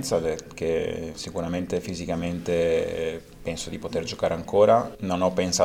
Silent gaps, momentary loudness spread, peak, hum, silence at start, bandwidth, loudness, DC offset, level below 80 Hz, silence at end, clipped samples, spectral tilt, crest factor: none; 12 LU; -6 dBFS; none; 0 s; 16 kHz; -26 LUFS; under 0.1%; -48 dBFS; 0 s; under 0.1%; -4.5 dB/octave; 18 dB